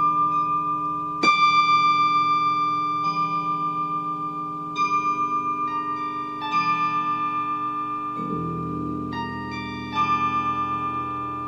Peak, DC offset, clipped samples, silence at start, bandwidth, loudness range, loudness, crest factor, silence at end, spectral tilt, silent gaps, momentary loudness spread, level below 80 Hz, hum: -6 dBFS; under 0.1%; under 0.1%; 0 s; 7.4 kHz; 6 LU; -23 LUFS; 16 dB; 0 s; -4.5 dB/octave; none; 11 LU; -56 dBFS; 60 Hz at -60 dBFS